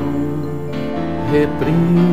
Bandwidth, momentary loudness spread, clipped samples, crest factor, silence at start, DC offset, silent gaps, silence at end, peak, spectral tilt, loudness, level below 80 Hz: 7.8 kHz; 9 LU; under 0.1%; 14 dB; 0 s; 4%; none; 0 s; -4 dBFS; -9 dB/octave; -18 LUFS; -38 dBFS